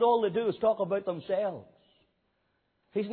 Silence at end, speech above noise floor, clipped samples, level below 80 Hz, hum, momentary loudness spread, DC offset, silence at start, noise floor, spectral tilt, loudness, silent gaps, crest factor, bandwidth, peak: 0 s; 47 dB; under 0.1%; -72 dBFS; none; 9 LU; under 0.1%; 0 s; -75 dBFS; -10 dB/octave; -30 LUFS; none; 16 dB; 4.5 kHz; -14 dBFS